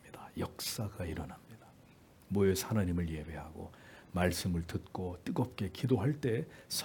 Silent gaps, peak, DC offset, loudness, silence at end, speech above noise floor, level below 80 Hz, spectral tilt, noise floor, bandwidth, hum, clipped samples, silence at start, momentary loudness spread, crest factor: none; -14 dBFS; under 0.1%; -36 LUFS; 0 s; 25 dB; -58 dBFS; -5.5 dB/octave; -60 dBFS; 18 kHz; none; under 0.1%; 0.05 s; 16 LU; 22 dB